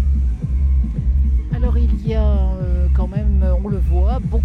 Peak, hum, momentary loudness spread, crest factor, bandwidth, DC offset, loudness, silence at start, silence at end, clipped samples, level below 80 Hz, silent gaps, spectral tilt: -6 dBFS; none; 2 LU; 8 dB; 3.3 kHz; under 0.1%; -19 LUFS; 0 s; 0 s; under 0.1%; -16 dBFS; none; -10 dB/octave